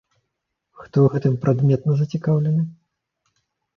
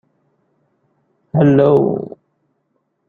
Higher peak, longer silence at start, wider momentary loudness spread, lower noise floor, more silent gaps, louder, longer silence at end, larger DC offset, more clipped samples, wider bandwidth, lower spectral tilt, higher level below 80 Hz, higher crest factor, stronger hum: about the same, -4 dBFS vs -2 dBFS; second, 0.8 s vs 1.35 s; second, 6 LU vs 14 LU; first, -78 dBFS vs -68 dBFS; neither; second, -20 LUFS vs -14 LUFS; about the same, 1.05 s vs 1 s; neither; neither; about the same, 6.4 kHz vs 6.6 kHz; about the same, -10 dB/octave vs -10.5 dB/octave; about the same, -58 dBFS vs -56 dBFS; about the same, 18 dB vs 16 dB; neither